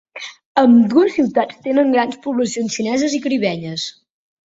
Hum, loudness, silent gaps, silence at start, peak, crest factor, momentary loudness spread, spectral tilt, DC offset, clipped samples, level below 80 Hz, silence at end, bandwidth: none; -17 LUFS; 0.46-0.55 s; 0.15 s; 0 dBFS; 16 dB; 14 LU; -5 dB/octave; under 0.1%; under 0.1%; -62 dBFS; 0.6 s; 8 kHz